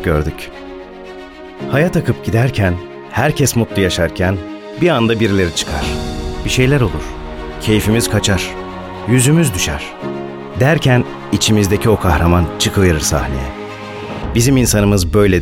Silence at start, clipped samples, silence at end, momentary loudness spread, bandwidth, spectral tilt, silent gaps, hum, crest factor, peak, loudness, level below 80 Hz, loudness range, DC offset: 0 s; under 0.1%; 0 s; 15 LU; 17 kHz; -5 dB/octave; none; none; 14 dB; 0 dBFS; -15 LUFS; -28 dBFS; 2 LU; under 0.1%